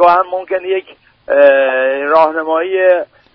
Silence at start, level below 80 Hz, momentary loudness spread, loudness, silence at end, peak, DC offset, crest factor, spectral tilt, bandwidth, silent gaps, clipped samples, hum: 0 s; -58 dBFS; 9 LU; -12 LUFS; 0.3 s; 0 dBFS; under 0.1%; 12 dB; -1 dB/octave; 5.4 kHz; none; under 0.1%; none